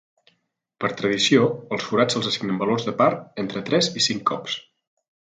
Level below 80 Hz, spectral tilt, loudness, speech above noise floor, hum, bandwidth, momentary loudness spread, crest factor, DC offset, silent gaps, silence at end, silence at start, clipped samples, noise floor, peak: -66 dBFS; -4 dB/octave; -22 LUFS; 50 dB; none; 9.4 kHz; 11 LU; 20 dB; under 0.1%; none; 0.75 s; 0.8 s; under 0.1%; -72 dBFS; -4 dBFS